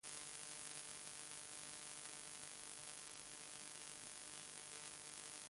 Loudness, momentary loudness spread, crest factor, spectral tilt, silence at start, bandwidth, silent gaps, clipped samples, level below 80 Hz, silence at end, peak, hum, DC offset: -52 LUFS; 2 LU; 24 dB; 0 dB/octave; 0.05 s; 11.5 kHz; none; under 0.1%; -84 dBFS; 0 s; -30 dBFS; none; under 0.1%